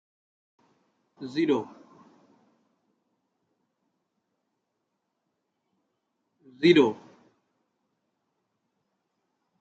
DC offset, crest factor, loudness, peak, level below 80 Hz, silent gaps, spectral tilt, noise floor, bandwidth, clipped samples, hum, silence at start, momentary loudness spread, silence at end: under 0.1%; 26 dB; -24 LUFS; -6 dBFS; -80 dBFS; none; -6.5 dB/octave; -80 dBFS; 7.8 kHz; under 0.1%; none; 1.2 s; 24 LU; 2.65 s